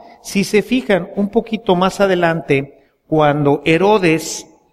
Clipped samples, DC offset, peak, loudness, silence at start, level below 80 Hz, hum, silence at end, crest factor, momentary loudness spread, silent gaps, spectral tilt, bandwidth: under 0.1%; under 0.1%; 0 dBFS; -16 LUFS; 0.25 s; -46 dBFS; none; 0.3 s; 14 dB; 7 LU; none; -5.5 dB/octave; 15 kHz